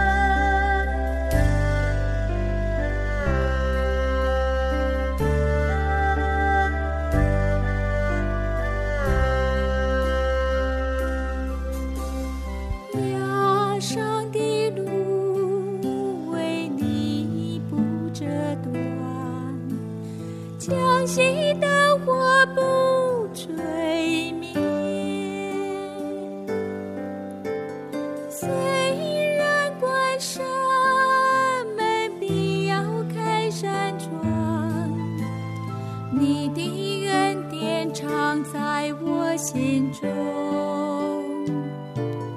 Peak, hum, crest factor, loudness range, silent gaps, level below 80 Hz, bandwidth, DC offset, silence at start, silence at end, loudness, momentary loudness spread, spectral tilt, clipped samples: -6 dBFS; none; 18 dB; 6 LU; none; -30 dBFS; 14 kHz; under 0.1%; 0 s; 0 s; -24 LUFS; 10 LU; -5.5 dB/octave; under 0.1%